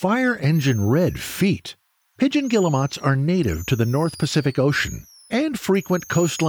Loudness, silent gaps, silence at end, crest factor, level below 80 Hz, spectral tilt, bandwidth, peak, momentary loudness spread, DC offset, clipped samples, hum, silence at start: -21 LUFS; none; 0 s; 14 dB; -44 dBFS; -6 dB/octave; over 20 kHz; -6 dBFS; 4 LU; under 0.1%; under 0.1%; none; 0 s